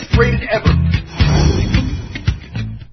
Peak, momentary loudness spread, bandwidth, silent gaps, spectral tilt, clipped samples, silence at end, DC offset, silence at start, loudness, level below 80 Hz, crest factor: 0 dBFS; 10 LU; 6.4 kHz; none; -6.5 dB/octave; under 0.1%; 0.1 s; under 0.1%; 0 s; -16 LUFS; -20 dBFS; 14 dB